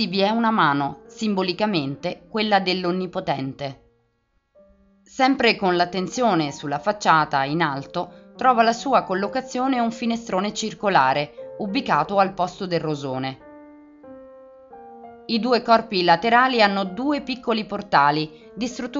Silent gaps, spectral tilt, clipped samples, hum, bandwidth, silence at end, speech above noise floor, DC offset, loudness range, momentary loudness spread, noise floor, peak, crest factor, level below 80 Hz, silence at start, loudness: none; -3 dB/octave; under 0.1%; none; 7.6 kHz; 0 s; 47 dB; under 0.1%; 5 LU; 12 LU; -68 dBFS; -2 dBFS; 20 dB; -60 dBFS; 0 s; -21 LUFS